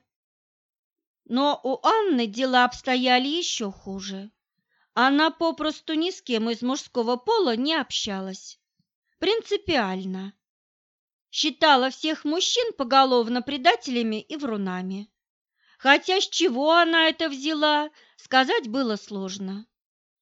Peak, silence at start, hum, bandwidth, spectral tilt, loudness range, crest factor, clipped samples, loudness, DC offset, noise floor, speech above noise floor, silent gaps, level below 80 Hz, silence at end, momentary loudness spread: -2 dBFS; 1.3 s; none; 8 kHz; -3 dB/octave; 4 LU; 22 dB; under 0.1%; -23 LUFS; under 0.1%; -71 dBFS; 48 dB; 8.95-9.02 s, 10.49-11.25 s, 15.30-15.45 s; -64 dBFS; 0.6 s; 14 LU